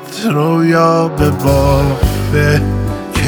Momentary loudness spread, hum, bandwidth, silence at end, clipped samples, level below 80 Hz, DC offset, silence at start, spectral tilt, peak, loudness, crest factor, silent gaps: 6 LU; none; over 20 kHz; 0 s; under 0.1%; -22 dBFS; under 0.1%; 0 s; -6.5 dB/octave; 0 dBFS; -13 LUFS; 12 dB; none